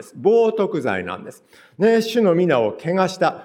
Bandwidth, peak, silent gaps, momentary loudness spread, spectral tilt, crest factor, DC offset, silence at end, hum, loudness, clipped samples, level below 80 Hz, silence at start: 15.5 kHz; -4 dBFS; none; 8 LU; -6 dB/octave; 16 dB; under 0.1%; 0 s; none; -19 LUFS; under 0.1%; -66 dBFS; 0 s